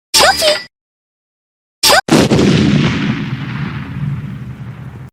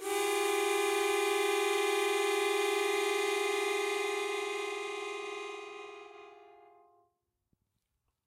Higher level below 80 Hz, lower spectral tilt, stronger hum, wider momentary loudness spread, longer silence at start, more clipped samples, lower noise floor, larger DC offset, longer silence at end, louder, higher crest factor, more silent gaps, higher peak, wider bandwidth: first, -40 dBFS vs -80 dBFS; first, -4 dB/octave vs 0 dB/octave; neither; first, 19 LU vs 13 LU; first, 0.15 s vs 0 s; first, 0.2% vs under 0.1%; first, under -90 dBFS vs -82 dBFS; neither; second, 0.05 s vs 1.8 s; first, -12 LUFS vs -31 LUFS; about the same, 14 dB vs 14 dB; first, 0.81-1.82 s vs none; first, 0 dBFS vs -20 dBFS; first, over 20 kHz vs 16 kHz